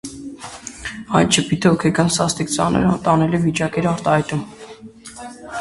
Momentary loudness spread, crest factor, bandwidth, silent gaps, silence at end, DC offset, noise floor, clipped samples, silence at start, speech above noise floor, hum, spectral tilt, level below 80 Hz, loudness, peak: 19 LU; 18 dB; 11.5 kHz; none; 0 s; under 0.1%; -39 dBFS; under 0.1%; 0.05 s; 22 dB; none; -5 dB/octave; -44 dBFS; -18 LUFS; 0 dBFS